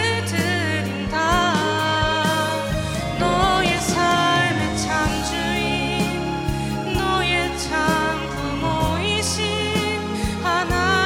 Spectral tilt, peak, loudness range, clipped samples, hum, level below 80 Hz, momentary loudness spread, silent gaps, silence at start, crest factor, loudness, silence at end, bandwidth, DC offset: -4 dB/octave; -6 dBFS; 2 LU; under 0.1%; none; -36 dBFS; 6 LU; none; 0 s; 16 dB; -21 LUFS; 0 s; 17.5 kHz; under 0.1%